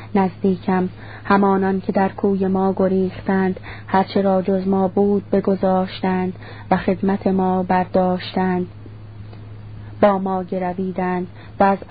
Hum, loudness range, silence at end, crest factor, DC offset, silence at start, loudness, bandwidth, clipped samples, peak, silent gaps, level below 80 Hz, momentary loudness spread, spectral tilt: none; 3 LU; 0.05 s; 18 dB; 0.5%; 0 s; -19 LUFS; 5 kHz; under 0.1%; -2 dBFS; none; -46 dBFS; 17 LU; -12.5 dB/octave